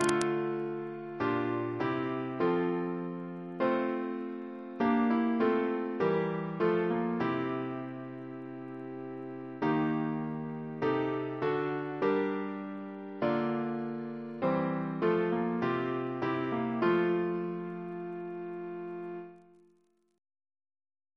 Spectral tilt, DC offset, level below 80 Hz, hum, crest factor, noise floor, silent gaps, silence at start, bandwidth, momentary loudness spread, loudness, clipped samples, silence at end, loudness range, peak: -7 dB/octave; under 0.1%; -72 dBFS; none; 24 dB; -70 dBFS; none; 0 s; 11 kHz; 13 LU; -33 LUFS; under 0.1%; 1.75 s; 5 LU; -8 dBFS